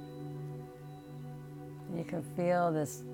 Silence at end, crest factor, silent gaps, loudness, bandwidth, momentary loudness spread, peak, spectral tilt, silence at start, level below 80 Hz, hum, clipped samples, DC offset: 0 s; 16 dB; none; -36 LUFS; 17 kHz; 17 LU; -20 dBFS; -7 dB/octave; 0 s; -68 dBFS; none; under 0.1%; under 0.1%